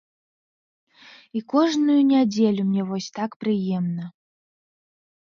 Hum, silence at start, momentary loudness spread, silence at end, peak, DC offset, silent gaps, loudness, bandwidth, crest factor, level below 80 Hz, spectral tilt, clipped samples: none; 1.35 s; 14 LU; 1.2 s; -6 dBFS; under 0.1%; 3.36-3.40 s; -22 LUFS; 7.4 kHz; 18 dB; -72 dBFS; -6.5 dB/octave; under 0.1%